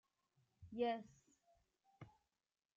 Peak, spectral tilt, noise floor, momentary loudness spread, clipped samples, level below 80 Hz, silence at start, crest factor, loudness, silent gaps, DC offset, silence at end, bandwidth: -30 dBFS; -4 dB/octave; -84 dBFS; 22 LU; under 0.1%; -80 dBFS; 0.6 s; 20 dB; -45 LUFS; none; under 0.1%; 0.7 s; 7.6 kHz